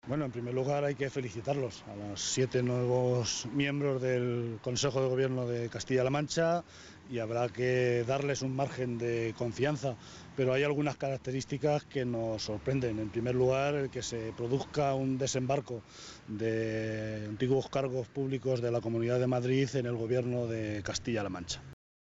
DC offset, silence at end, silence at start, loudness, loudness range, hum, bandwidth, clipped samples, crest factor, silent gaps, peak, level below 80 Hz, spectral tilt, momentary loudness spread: under 0.1%; 0.35 s; 0.05 s; -33 LUFS; 2 LU; none; 8 kHz; under 0.1%; 16 dB; none; -16 dBFS; -60 dBFS; -5.5 dB/octave; 8 LU